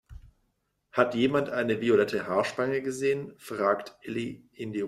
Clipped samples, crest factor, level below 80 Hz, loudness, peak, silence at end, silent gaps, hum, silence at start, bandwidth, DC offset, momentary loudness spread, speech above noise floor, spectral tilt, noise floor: under 0.1%; 22 dB; -60 dBFS; -28 LUFS; -6 dBFS; 0 s; none; none; 0.1 s; 14 kHz; under 0.1%; 12 LU; 48 dB; -5.5 dB/octave; -75 dBFS